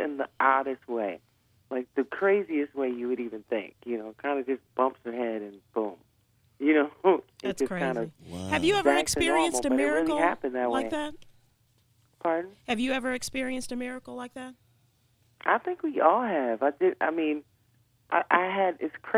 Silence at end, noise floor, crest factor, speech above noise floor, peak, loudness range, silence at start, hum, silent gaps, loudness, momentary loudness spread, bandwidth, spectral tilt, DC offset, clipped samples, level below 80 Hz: 0 s; -67 dBFS; 24 dB; 39 dB; -6 dBFS; 7 LU; 0 s; none; none; -28 LUFS; 12 LU; 15.5 kHz; -4 dB/octave; under 0.1%; under 0.1%; -60 dBFS